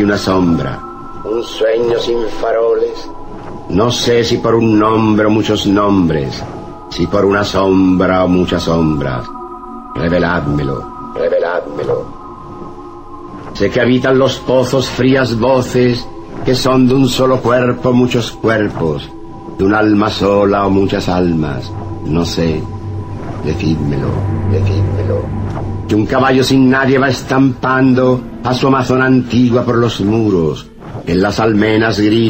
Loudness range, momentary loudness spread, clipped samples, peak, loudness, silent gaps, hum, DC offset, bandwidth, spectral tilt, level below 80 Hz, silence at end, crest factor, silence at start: 5 LU; 15 LU; under 0.1%; -2 dBFS; -13 LUFS; none; none; under 0.1%; 16 kHz; -6.5 dB/octave; -32 dBFS; 0 s; 12 dB; 0 s